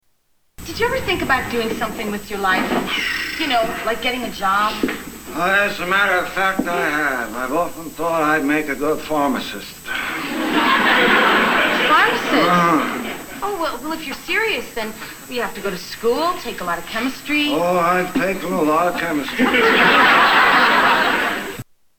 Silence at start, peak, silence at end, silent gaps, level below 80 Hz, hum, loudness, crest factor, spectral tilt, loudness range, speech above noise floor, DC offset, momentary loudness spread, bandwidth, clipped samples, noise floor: 0.6 s; -2 dBFS; 0.35 s; none; -46 dBFS; none; -17 LUFS; 16 dB; -3.5 dB/octave; 8 LU; 42 dB; under 0.1%; 13 LU; 19.5 kHz; under 0.1%; -61 dBFS